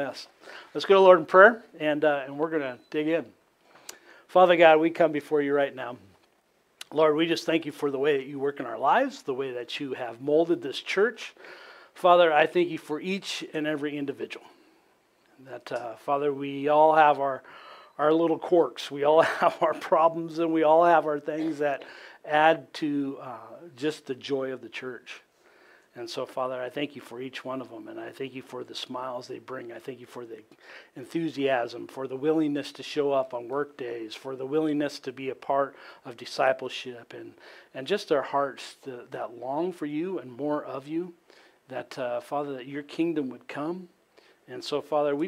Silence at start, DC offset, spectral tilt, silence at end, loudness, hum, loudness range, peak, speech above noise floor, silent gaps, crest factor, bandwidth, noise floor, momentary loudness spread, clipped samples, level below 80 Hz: 0 s; under 0.1%; -5 dB/octave; 0 s; -26 LUFS; none; 12 LU; -2 dBFS; 41 dB; none; 24 dB; 15 kHz; -67 dBFS; 22 LU; under 0.1%; -80 dBFS